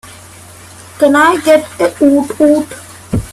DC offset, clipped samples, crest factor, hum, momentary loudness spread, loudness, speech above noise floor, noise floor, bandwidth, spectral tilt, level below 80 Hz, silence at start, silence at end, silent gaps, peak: under 0.1%; under 0.1%; 12 dB; none; 12 LU; -11 LUFS; 25 dB; -35 dBFS; 14 kHz; -5.5 dB/octave; -38 dBFS; 0.05 s; 0 s; none; 0 dBFS